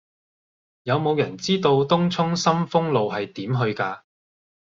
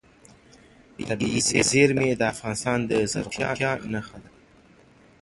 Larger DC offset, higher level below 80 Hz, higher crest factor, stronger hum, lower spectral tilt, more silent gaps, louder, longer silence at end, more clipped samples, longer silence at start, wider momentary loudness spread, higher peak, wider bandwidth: neither; second, -62 dBFS vs -52 dBFS; about the same, 20 dB vs 22 dB; neither; first, -6 dB/octave vs -4 dB/octave; neither; about the same, -22 LUFS vs -24 LUFS; second, 0.8 s vs 1 s; neither; second, 0.85 s vs 1 s; second, 9 LU vs 13 LU; about the same, -4 dBFS vs -4 dBFS; second, 7.6 kHz vs 11.5 kHz